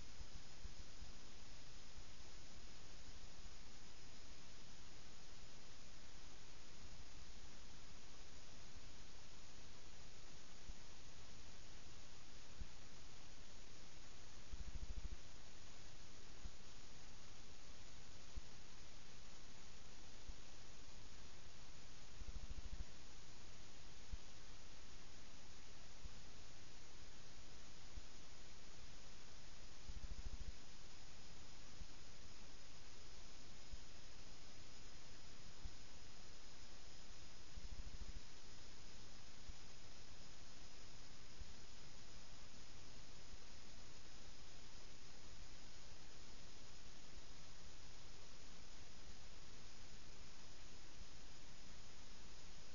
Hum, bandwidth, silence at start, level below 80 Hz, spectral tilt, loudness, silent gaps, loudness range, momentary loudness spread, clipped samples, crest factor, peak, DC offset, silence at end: none; 7.2 kHz; 0 s; -60 dBFS; -3 dB/octave; -60 LUFS; none; 2 LU; 4 LU; under 0.1%; 20 dB; -34 dBFS; 0.7%; 0 s